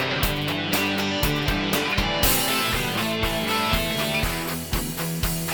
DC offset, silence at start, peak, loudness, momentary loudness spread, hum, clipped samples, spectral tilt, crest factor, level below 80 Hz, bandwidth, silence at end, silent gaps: 0.2%; 0 s; -6 dBFS; -23 LUFS; 6 LU; none; under 0.1%; -3.5 dB/octave; 18 dB; -34 dBFS; over 20 kHz; 0 s; none